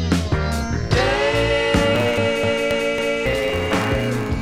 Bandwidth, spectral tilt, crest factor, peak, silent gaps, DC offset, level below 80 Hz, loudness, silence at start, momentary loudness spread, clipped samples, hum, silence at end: 16.5 kHz; -5.5 dB/octave; 16 dB; -4 dBFS; none; under 0.1%; -30 dBFS; -19 LUFS; 0 s; 5 LU; under 0.1%; none; 0 s